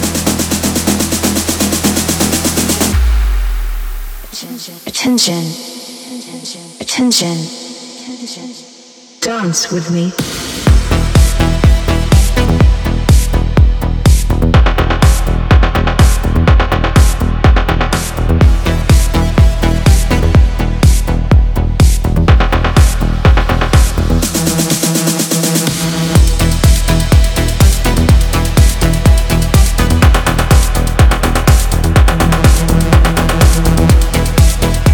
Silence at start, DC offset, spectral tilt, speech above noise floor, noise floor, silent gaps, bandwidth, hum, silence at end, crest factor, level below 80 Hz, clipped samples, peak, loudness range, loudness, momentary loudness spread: 0 s; under 0.1%; -5 dB/octave; 24 dB; -38 dBFS; none; 19.5 kHz; none; 0 s; 10 dB; -12 dBFS; under 0.1%; 0 dBFS; 6 LU; -12 LUFS; 11 LU